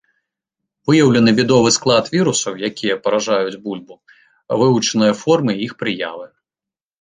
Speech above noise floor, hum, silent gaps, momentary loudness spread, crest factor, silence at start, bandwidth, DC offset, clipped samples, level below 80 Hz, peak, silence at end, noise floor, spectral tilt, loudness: 73 dB; none; none; 14 LU; 16 dB; 0.85 s; 9.8 kHz; under 0.1%; under 0.1%; -56 dBFS; -2 dBFS; 0.75 s; -89 dBFS; -4.5 dB/octave; -16 LUFS